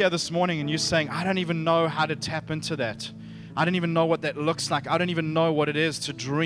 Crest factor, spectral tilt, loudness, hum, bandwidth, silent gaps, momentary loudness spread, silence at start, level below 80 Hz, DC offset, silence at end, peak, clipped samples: 16 dB; -5 dB/octave; -25 LUFS; none; 11 kHz; none; 7 LU; 0 s; -58 dBFS; under 0.1%; 0 s; -8 dBFS; under 0.1%